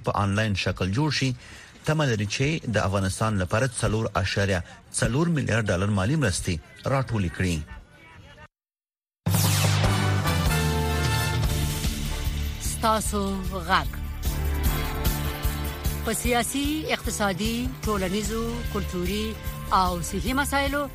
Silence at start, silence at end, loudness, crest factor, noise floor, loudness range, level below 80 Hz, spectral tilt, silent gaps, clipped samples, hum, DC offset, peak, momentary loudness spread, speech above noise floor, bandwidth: 0 s; 0 s; -26 LUFS; 18 dB; under -90 dBFS; 3 LU; -34 dBFS; -5 dB/octave; none; under 0.1%; none; under 0.1%; -6 dBFS; 6 LU; over 65 dB; 15.5 kHz